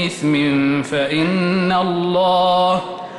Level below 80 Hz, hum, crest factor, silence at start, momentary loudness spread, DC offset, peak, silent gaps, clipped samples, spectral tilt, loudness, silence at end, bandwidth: -54 dBFS; none; 10 dB; 0 s; 4 LU; under 0.1%; -6 dBFS; none; under 0.1%; -6 dB/octave; -17 LUFS; 0 s; 11.5 kHz